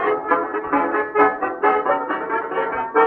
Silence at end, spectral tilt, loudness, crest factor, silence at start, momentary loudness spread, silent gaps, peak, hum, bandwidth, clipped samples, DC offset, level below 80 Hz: 0 s; -8 dB/octave; -20 LUFS; 16 dB; 0 s; 5 LU; none; -4 dBFS; none; 4.4 kHz; under 0.1%; under 0.1%; -58 dBFS